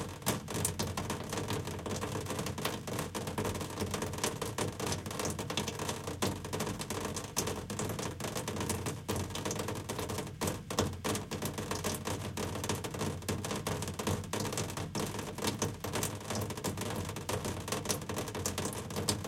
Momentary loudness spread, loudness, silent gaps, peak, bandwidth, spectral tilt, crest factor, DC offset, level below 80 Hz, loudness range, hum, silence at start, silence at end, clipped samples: 3 LU; -37 LUFS; none; -14 dBFS; 17 kHz; -4 dB/octave; 22 dB; under 0.1%; -56 dBFS; 1 LU; none; 0 s; 0 s; under 0.1%